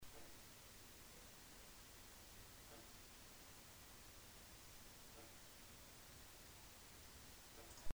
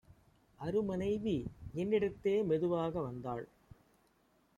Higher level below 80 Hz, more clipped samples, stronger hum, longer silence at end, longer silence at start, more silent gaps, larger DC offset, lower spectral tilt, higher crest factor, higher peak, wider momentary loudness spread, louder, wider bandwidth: second, -68 dBFS vs -62 dBFS; neither; neither; second, 0 s vs 1.1 s; about the same, 0 s vs 0.1 s; neither; neither; second, -2.5 dB/octave vs -8 dB/octave; first, 22 dB vs 16 dB; second, -34 dBFS vs -22 dBFS; second, 1 LU vs 11 LU; second, -60 LUFS vs -36 LUFS; first, over 20 kHz vs 9.4 kHz